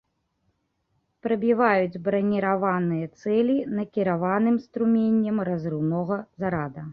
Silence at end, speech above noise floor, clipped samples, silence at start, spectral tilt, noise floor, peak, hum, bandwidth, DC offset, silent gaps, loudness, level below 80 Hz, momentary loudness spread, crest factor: 0 s; 49 dB; under 0.1%; 1.25 s; -9.5 dB/octave; -73 dBFS; -6 dBFS; none; 6 kHz; under 0.1%; none; -24 LUFS; -62 dBFS; 8 LU; 18 dB